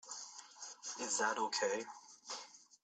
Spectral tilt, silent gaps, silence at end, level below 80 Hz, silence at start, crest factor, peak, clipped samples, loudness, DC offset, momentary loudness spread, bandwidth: 0 dB/octave; none; 0.2 s; -90 dBFS; 0.05 s; 20 dB; -22 dBFS; under 0.1%; -40 LUFS; under 0.1%; 16 LU; 9.4 kHz